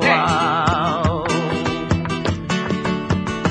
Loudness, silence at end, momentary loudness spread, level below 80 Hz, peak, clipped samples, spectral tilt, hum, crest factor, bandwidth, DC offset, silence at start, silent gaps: -20 LUFS; 0 s; 6 LU; -38 dBFS; -2 dBFS; under 0.1%; -5.5 dB/octave; none; 18 dB; 10 kHz; under 0.1%; 0 s; none